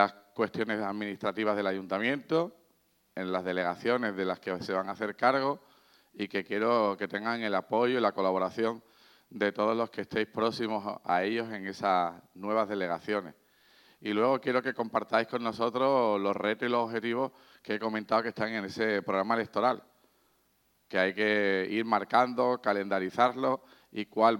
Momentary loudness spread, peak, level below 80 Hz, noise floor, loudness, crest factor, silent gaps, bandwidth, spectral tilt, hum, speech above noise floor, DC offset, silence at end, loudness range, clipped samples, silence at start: 8 LU; -8 dBFS; -78 dBFS; -71 dBFS; -30 LUFS; 22 dB; none; 17.5 kHz; -6 dB/octave; none; 41 dB; under 0.1%; 0 s; 3 LU; under 0.1%; 0 s